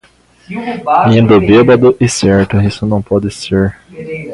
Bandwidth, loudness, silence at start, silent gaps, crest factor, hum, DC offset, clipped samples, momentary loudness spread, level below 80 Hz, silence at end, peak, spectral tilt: 11.5 kHz; -10 LUFS; 0.5 s; none; 10 dB; none; under 0.1%; under 0.1%; 16 LU; -34 dBFS; 0 s; 0 dBFS; -6.5 dB/octave